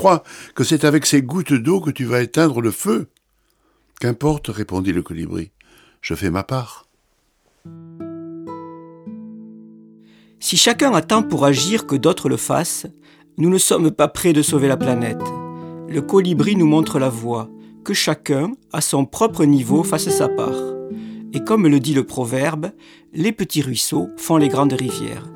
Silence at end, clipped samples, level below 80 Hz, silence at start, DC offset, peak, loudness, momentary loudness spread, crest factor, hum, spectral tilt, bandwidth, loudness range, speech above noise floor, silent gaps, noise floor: 0 s; under 0.1%; -52 dBFS; 0 s; under 0.1%; 0 dBFS; -18 LUFS; 18 LU; 18 dB; none; -4.5 dB/octave; 18.5 kHz; 11 LU; 46 dB; none; -63 dBFS